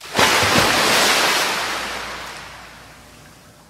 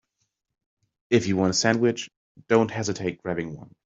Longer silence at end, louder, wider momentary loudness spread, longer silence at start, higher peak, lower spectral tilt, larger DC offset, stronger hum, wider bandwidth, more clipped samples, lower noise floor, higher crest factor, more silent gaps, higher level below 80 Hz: first, 0.4 s vs 0.2 s; first, -16 LUFS vs -24 LUFS; first, 20 LU vs 12 LU; second, 0 s vs 1.1 s; first, 0 dBFS vs -4 dBFS; second, -1.5 dB/octave vs -4.5 dB/octave; neither; neither; first, 16 kHz vs 8 kHz; neither; second, -45 dBFS vs -77 dBFS; about the same, 20 dB vs 20 dB; second, none vs 2.17-2.35 s; first, -46 dBFS vs -62 dBFS